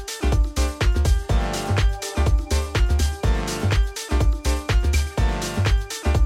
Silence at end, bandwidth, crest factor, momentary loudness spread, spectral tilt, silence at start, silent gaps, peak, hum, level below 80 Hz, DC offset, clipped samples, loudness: 0 s; 15.5 kHz; 12 dB; 3 LU; -5 dB/octave; 0 s; none; -8 dBFS; none; -22 dBFS; under 0.1%; under 0.1%; -23 LUFS